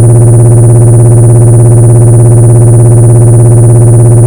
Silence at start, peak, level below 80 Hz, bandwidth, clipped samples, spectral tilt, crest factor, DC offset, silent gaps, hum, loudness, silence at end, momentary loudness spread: 0 s; 0 dBFS; -20 dBFS; 12 kHz; 80%; -9 dB/octave; 0 dB; under 0.1%; none; 50 Hz at -15 dBFS; -2 LUFS; 0 s; 0 LU